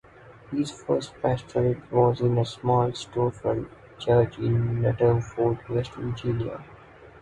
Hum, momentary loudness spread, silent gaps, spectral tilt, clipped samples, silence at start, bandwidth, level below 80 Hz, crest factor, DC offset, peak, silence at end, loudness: none; 9 LU; none; -7.5 dB/octave; under 0.1%; 0.25 s; 9.2 kHz; -50 dBFS; 18 dB; under 0.1%; -8 dBFS; 0.05 s; -26 LUFS